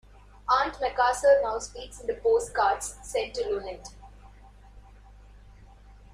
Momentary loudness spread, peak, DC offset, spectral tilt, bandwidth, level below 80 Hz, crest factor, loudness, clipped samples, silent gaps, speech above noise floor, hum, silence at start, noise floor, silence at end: 17 LU; -10 dBFS; under 0.1%; -2.5 dB/octave; 15 kHz; -50 dBFS; 18 dB; -26 LUFS; under 0.1%; none; 24 dB; 50 Hz at -50 dBFS; 0.45 s; -51 dBFS; 0.2 s